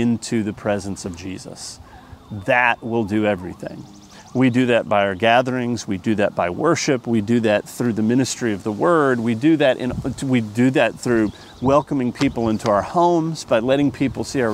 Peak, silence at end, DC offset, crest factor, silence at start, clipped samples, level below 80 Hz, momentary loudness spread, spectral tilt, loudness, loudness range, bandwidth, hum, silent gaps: -2 dBFS; 0 s; under 0.1%; 18 dB; 0 s; under 0.1%; -48 dBFS; 13 LU; -5.5 dB/octave; -19 LUFS; 4 LU; 15 kHz; none; none